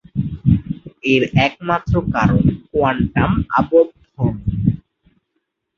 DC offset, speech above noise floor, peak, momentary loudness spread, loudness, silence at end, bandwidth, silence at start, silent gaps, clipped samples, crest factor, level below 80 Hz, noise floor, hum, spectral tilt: under 0.1%; 57 dB; -2 dBFS; 8 LU; -17 LUFS; 1 s; 7 kHz; 0.15 s; none; under 0.1%; 16 dB; -32 dBFS; -73 dBFS; none; -8 dB/octave